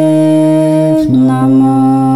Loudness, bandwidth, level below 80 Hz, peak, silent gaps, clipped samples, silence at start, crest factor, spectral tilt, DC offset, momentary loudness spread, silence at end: -9 LUFS; 12 kHz; -44 dBFS; 0 dBFS; none; under 0.1%; 0 s; 8 dB; -8.5 dB/octave; under 0.1%; 1 LU; 0 s